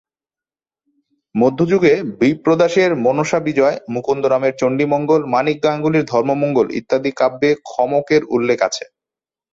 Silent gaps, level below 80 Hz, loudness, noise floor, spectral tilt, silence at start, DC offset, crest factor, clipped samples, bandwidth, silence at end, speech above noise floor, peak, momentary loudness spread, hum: none; -58 dBFS; -16 LUFS; under -90 dBFS; -6 dB/octave; 1.35 s; under 0.1%; 14 dB; under 0.1%; 7.8 kHz; 0.7 s; over 74 dB; -2 dBFS; 5 LU; none